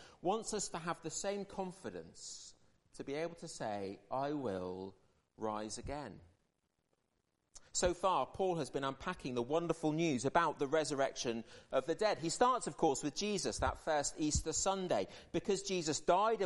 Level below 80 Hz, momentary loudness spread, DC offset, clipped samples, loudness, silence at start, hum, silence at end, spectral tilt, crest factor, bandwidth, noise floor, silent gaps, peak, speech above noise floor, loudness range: -58 dBFS; 12 LU; under 0.1%; under 0.1%; -37 LUFS; 0 s; none; 0 s; -4 dB/octave; 22 dB; 11.5 kHz; -83 dBFS; none; -16 dBFS; 46 dB; 8 LU